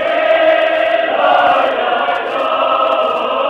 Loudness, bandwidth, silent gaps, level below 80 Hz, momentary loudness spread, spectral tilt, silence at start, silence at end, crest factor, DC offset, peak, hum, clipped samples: -13 LUFS; 7.2 kHz; none; -58 dBFS; 5 LU; -4 dB/octave; 0 s; 0 s; 12 dB; under 0.1%; 0 dBFS; none; under 0.1%